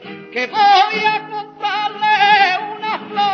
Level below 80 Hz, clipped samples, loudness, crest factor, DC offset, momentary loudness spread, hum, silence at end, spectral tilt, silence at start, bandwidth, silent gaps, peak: -64 dBFS; under 0.1%; -15 LUFS; 16 dB; under 0.1%; 12 LU; none; 0 s; -3 dB/octave; 0 s; 6.8 kHz; none; 0 dBFS